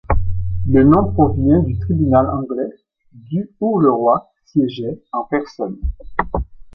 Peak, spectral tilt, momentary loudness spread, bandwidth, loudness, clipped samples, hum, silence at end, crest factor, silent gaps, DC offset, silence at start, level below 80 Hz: 0 dBFS; -10.5 dB/octave; 12 LU; 6.2 kHz; -18 LUFS; under 0.1%; none; 0.1 s; 16 dB; none; under 0.1%; 0.1 s; -28 dBFS